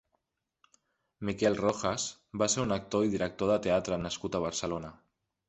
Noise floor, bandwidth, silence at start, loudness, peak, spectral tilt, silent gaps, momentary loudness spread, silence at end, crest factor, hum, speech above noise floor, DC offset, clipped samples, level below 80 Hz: -80 dBFS; 8.4 kHz; 1.2 s; -31 LUFS; -12 dBFS; -4 dB/octave; none; 9 LU; 0.55 s; 20 dB; none; 50 dB; under 0.1%; under 0.1%; -58 dBFS